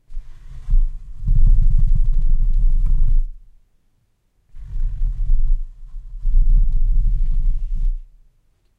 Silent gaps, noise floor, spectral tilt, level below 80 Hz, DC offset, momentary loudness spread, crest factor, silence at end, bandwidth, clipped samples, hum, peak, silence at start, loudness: none; -62 dBFS; -9.5 dB/octave; -16 dBFS; under 0.1%; 18 LU; 12 dB; 0.75 s; 0.3 kHz; under 0.1%; none; -4 dBFS; 0.1 s; -24 LUFS